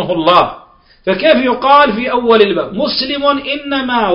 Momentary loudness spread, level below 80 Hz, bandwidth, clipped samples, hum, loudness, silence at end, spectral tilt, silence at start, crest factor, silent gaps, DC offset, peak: 8 LU; -44 dBFS; 5.6 kHz; 0.1%; none; -12 LUFS; 0 s; -7 dB/octave; 0 s; 12 dB; none; under 0.1%; 0 dBFS